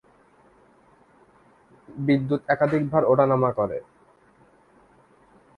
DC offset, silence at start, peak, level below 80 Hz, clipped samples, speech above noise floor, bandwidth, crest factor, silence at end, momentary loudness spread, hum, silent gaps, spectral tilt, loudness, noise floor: under 0.1%; 1.9 s; -6 dBFS; -60 dBFS; under 0.1%; 36 dB; 9.2 kHz; 20 dB; 1.75 s; 11 LU; none; none; -9.5 dB/octave; -23 LUFS; -57 dBFS